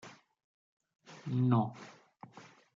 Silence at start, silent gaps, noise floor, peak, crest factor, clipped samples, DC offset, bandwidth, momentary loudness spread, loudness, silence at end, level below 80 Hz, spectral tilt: 0.05 s; 0.44-0.80 s, 0.95-0.99 s; -57 dBFS; -16 dBFS; 22 dB; under 0.1%; under 0.1%; 7.4 kHz; 26 LU; -33 LUFS; 0.35 s; -84 dBFS; -8.5 dB/octave